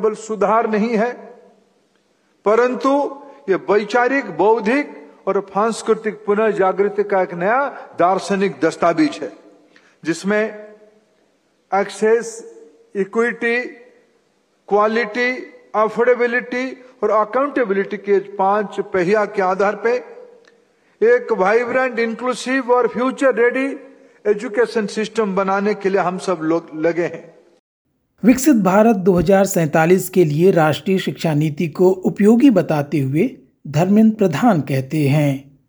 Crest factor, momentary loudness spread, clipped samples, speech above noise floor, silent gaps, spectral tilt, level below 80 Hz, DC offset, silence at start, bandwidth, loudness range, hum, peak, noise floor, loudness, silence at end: 18 dB; 10 LU; under 0.1%; 45 dB; 27.59-27.85 s; -6.5 dB/octave; -54 dBFS; under 0.1%; 0 s; over 20 kHz; 6 LU; none; 0 dBFS; -61 dBFS; -17 LUFS; 0.25 s